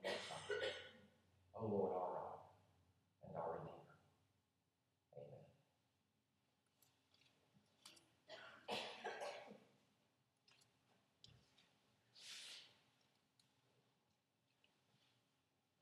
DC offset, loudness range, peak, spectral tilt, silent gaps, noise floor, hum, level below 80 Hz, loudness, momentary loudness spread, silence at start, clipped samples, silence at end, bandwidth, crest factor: under 0.1%; 19 LU; -30 dBFS; -4 dB/octave; none; -87 dBFS; none; under -90 dBFS; -50 LUFS; 23 LU; 0 s; under 0.1%; 3.1 s; 13 kHz; 24 dB